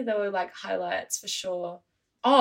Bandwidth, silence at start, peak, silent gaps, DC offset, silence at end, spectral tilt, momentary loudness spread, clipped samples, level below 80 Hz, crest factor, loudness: 16 kHz; 0 s; -6 dBFS; none; under 0.1%; 0 s; -2 dB/octave; 7 LU; under 0.1%; -78 dBFS; 20 dB; -29 LUFS